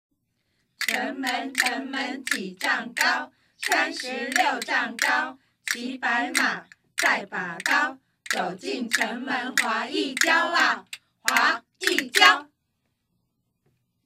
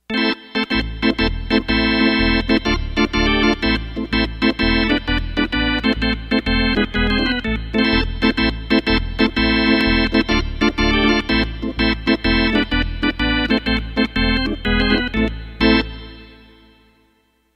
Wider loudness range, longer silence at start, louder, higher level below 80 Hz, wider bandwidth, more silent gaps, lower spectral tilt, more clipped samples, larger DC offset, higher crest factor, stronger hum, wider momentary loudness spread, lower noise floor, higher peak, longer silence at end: about the same, 4 LU vs 2 LU; first, 0.8 s vs 0.1 s; second, -24 LUFS vs -18 LUFS; second, -78 dBFS vs -26 dBFS; first, 16 kHz vs 8.8 kHz; neither; second, -1 dB/octave vs -6 dB/octave; neither; neither; first, 24 dB vs 16 dB; neither; first, 10 LU vs 5 LU; first, -75 dBFS vs -61 dBFS; about the same, -2 dBFS vs -2 dBFS; first, 1.6 s vs 1.2 s